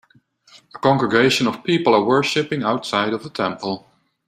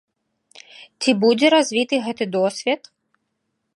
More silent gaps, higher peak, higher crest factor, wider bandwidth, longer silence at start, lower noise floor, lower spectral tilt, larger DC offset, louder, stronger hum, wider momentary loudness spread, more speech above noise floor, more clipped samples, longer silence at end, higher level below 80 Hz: neither; about the same, -2 dBFS vs -2 dBFS; about the same, 18 dB vs 20 dB; first, 14 kHz vs 11.5 kHz; about the same, 0.75 s vs 0.8 s; second, -55 dBFS vs -75 dBFS; about the same, -5 dB/octave vs -4 dB/octave; neither; about the same, -19 LUFS vs -19 LUFS; neither; about the same, 9 LU vs 9 LU; second, 36 dB vs 56 dB; neither; second, 0.5 s vs 1 s; first, -60 dBFS vs -76 dBFS